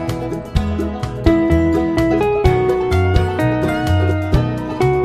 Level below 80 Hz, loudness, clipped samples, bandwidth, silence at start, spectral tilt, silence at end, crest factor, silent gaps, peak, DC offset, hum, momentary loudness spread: -24 dBFS; -17 LUFS; under 0.1%; 14.5 kHz; 0 s; -7.5 dB/octave; 0 s; 16 dB; none; 0 dBFS; under 0.1%; none; 7 LU